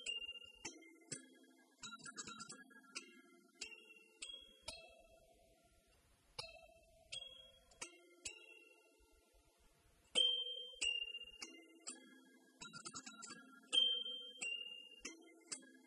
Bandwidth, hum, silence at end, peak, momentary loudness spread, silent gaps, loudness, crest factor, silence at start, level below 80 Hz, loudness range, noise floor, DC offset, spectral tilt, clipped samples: 12 kHz; none; 0.05 s; -24 dBFS; 23 LU; none; -44 LUFS; 24 dB; 0 s; -80 dBFS; 14 LU; -73 dBFS; under 0.1%; 0.5 dB/octave; under 0.1%